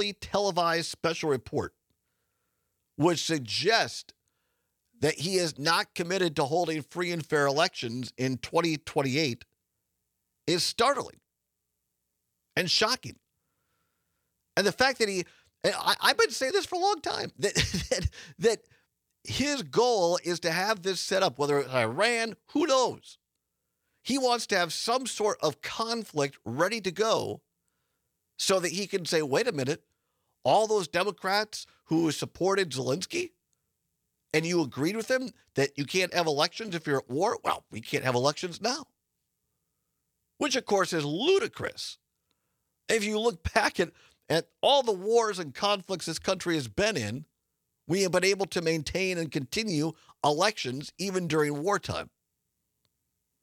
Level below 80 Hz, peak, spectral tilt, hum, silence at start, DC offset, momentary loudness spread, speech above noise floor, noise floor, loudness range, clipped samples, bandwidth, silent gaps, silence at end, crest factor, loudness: -56 dBFS; -6 dBFS; -3.5 dB/octave; none; 0 s; under 0.1%; 9 LU; 55 dB; -83 dBFS; 4 LU; under 0.1%; 18 kHz; none; 1.35 s; 24 dB; -28 LUFS